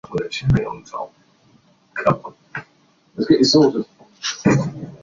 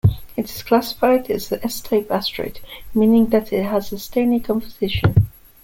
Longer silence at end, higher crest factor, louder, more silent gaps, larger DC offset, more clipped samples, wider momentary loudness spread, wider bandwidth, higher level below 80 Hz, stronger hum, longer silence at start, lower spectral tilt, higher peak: second, 0.05 s vs 0.35 s; about the same, 18 dB vs 16 dB; about the same, -19 LUFS vs -20 LUFS; neither; neither; neither; first, 20 LU vs 11 LU; second, 7.6 kHz vs 17 kHz; second, -44 dBFS vs -38 dBFS; neither; about the same, 0.1 s vs 0.05 s; about the same, -5.5 dB/octave vs -6.5 dB/octave; about the same, -2 dBFS vs -2 dBFS